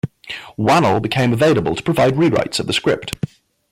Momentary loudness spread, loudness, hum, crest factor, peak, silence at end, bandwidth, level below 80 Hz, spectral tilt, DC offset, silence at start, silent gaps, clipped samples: 13 LU; -17 LUFS; none; 12 dB; -6 dBFS; 0.45 s; 16 kHz; -48 dBFS; -5.5 dB/octave; under 0.1%; 0.05 s; none; under 0.1%